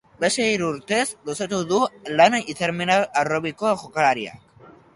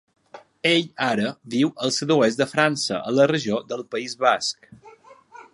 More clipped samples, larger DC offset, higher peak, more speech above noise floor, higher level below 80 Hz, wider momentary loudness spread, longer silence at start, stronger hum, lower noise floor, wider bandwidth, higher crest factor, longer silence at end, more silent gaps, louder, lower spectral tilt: neither; neither; about the same, -2 dBFS vs -2 dBFS; about the same, 28 dB vs 26 dB; first, -62 dBFS vs -68 dBFS; about the same, 9 LU vs 9 LU; second, 0.2 s vs 0.35 s; neither; about the same, -49 dBFS vs -48 dBFS; about the same, 11.5 kHz vs 11.5 kHz; about the same, 20 dB vs 22 dB; first, 0.25 s vs 0.1 s; neither; about the same, -22 LUFS vs -22 LUFS; about the same, -3.5 dB/octave vs -4 dB/octave